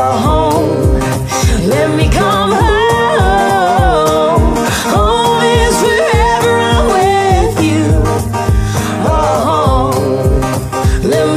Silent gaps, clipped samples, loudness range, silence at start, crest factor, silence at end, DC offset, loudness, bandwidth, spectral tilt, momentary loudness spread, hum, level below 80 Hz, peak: none; under 0.1%; 2 LU; 0 s; 10 dB; 0 s; under 0.1%; -11 LUFS; 15.5 kHz; -5.5 dB/octave; 4 LU; none; -18 dBFS; 0 dBFS